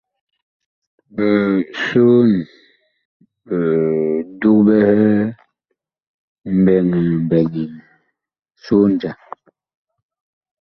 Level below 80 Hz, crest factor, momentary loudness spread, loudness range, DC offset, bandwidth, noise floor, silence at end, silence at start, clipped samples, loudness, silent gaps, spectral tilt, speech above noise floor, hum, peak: -52 dBFS; 16 dB; 14 LU; 4 LU; under 0.1%; 7 kHz; -75 dBFS; 1.5 s; 1.15 s; under 0.1%; -16 LUFS; 3.05-3.20 s, 6.07-6.36 s; -9 dB/octave; 61 dB; none; -2 dBFS